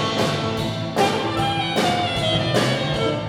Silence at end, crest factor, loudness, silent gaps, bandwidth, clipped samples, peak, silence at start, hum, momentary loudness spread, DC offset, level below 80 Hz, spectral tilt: 0 s; 16 dB; -21 LUFS; none; 18.5 kHz; under 0.1%; -6 dBFS; 0 s; none; 4 LU; under 0.1%; -44 dBFS; -5 dB/octave